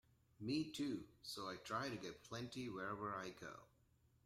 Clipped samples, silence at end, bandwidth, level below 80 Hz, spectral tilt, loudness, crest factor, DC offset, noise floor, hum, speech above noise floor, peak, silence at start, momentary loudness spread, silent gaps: under 0.1%; 0.6 s; 16 kHz; -76 dBFS; -5 dB/octave; -48 LUFS; 18 dB; under 0.1%; -76 dBFS; none; 28 dB; -30 dBFS; 0.4 s; 9 LU; none